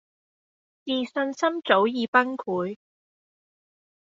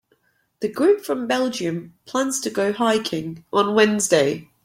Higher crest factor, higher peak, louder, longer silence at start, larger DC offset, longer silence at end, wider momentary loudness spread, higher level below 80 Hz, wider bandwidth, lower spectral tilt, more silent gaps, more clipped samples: first, 24 dB vs 18 dB; about the same, -4 dBFS vs -2 dBFS; second, -25 LUFS vs -21 LUFS; first, 0.85 s vs 0.6 s; neither; first, 1.4 s vs 0.2 s; about the same, 12 LU vs 10 LU; second, -74 dBFS vs -64 dBFS; second, 7.8 kHz vs 16.5 kHz; second, -2 dB/octave vs -3.5 dB/octave; first, 2.08-2.13 s vs none; neither